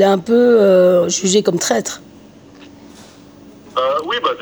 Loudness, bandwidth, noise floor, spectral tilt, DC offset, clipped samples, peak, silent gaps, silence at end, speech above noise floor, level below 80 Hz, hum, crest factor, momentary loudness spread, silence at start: -14 LUFS; over 20 kHz; -41 dBFS; -4 dB/octave; under 0.1%; under 0.1%; -2 dBFS; none; 0 s; 28 dB; -60 dBFS; none; 14 dB; 11 LU; 0 s